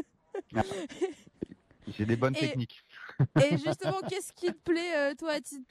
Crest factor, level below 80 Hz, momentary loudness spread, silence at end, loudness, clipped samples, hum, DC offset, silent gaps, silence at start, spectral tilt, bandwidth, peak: 18 dB; -62 dBFS; 18 LU; 0.05 s; -31 LUFS; under 0.1%; none; under 0.1%; none; 0 s; -6 dB/octave; 14 kHz; -14 dBFS